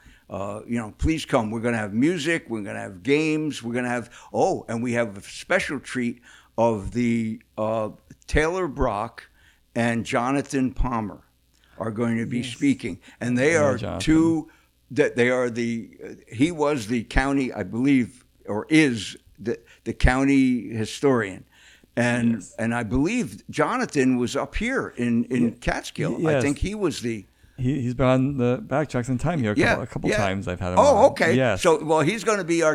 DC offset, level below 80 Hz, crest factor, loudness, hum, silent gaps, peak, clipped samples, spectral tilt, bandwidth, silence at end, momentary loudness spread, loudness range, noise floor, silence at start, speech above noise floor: under 0.1%; -38 dBFS; 20 dB; -24 LUFS; none; none; -4 dBFS; under 0.1%; -6 dB/octave; 13.5 kHz; 0 s; 12 LU; 5 LU; -59 dBFS; 0.3 s; 36 dB